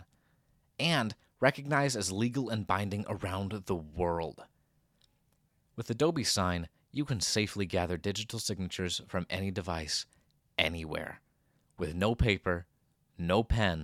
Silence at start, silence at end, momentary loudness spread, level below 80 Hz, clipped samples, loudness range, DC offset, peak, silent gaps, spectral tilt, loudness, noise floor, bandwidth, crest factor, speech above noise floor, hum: 0 s; 0 s; 10 LU; -48 dBFS; under 0.1%; 4 LU; under 0.1%; -8 dBFS; none; -4.5 dB/octave; -32 LUFS; -73 dBFS; 16 kHz; 26 dB; 41 dB; none